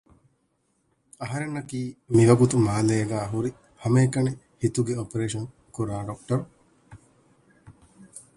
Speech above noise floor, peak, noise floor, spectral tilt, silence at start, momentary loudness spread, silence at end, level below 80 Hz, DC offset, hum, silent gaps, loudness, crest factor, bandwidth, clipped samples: 47 dB; -4 dBFS; -71 dBFS; -7 dB/octave; 1.2 s; 15 LU; 0.15 s; -54 dBFS; under 0.1%; none; none; -25 LUFS; 22 dB; 11.5 kHz; under 0.1%